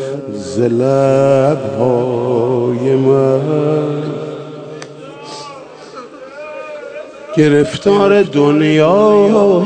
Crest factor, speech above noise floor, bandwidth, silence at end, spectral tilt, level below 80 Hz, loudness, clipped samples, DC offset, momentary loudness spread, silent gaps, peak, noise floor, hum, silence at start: 14 dB; 21 dB; 9.4 kHz; 0 s; -7 dB/octave; -54 dBFS; -12 LUFS; under 0.1%; under 0.1%; 20 LU; none; 0 dBFS; -32 dBFS; none; 0 s